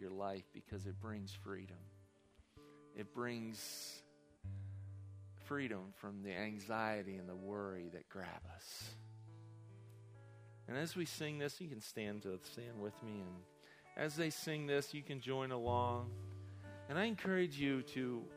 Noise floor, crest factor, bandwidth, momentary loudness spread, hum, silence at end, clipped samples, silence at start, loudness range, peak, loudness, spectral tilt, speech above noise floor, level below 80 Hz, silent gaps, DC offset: -70 dBFS; 22 dB; 15.5 kHz; 19 LU; none; 0 s; under 0.1%; 0 s; 9 LU; -24 dBFS; -45 LUFS; -5 dB/octave; 26 dB; -74 dBFS; none; under 0.1%